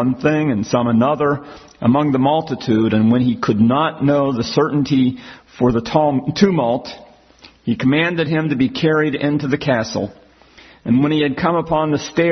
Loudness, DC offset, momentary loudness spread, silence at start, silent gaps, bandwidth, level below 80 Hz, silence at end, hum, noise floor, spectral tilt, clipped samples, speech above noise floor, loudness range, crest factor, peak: -17 LUFS; under 0.1%; 5 LU; 0 s; none; 6.4 kHz; -48 dBFS; 0 s; none; -47 dBFS; -7 dB/octave; under 0.1%; 30 dB; 2 LU; 16 dB; 0 dBFS